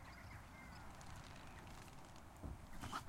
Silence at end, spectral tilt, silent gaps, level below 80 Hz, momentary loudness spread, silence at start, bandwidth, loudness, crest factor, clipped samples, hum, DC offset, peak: 0 s; -4.5 dB/octave; none; -60 dBFS; 4 LU; 0 s; 16 kHz; -56 LUFS; 20 dB; under 0.1%; none; under 0.1%; -34 dBFS